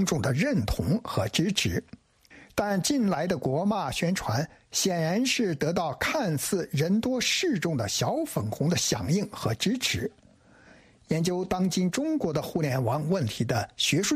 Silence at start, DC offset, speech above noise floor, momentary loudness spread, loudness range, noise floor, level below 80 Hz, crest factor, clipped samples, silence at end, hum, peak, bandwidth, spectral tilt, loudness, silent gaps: 0 s; under 0.1%; 30 dB; 4 LU; 2 LU; -56 dBFS; -50 dBFS; 16 dB; under 0.1%; 0 s; none; -10 dBFS; 15.5 kHz; -4.5 dB/octave; -27 LUFS; none